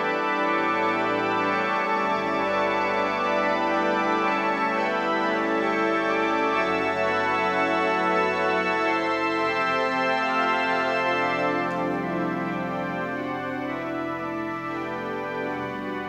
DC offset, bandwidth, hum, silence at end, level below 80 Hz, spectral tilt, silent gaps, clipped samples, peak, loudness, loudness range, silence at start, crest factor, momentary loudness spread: under 0.1%; 15 kHz; none; 0 s; -62 dBFS; -5.5 dB/octave; none; under 0.1%; -10 dBFS; -24 LUFS; 5 LU; 0 s; 16 dB; 7 LU